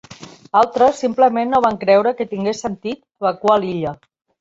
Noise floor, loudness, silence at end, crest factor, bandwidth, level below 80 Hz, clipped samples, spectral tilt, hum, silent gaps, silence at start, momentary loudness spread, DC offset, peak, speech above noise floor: -40 dBFS; -17 LUFS; 0.45 s; 16 dB; 8 kHz; -56 dBFS; under 0.1%; -5.5 dB/octave; none; none; 0.1 s; 11 LU; under 0.1%; -2 dBFS; 23 dB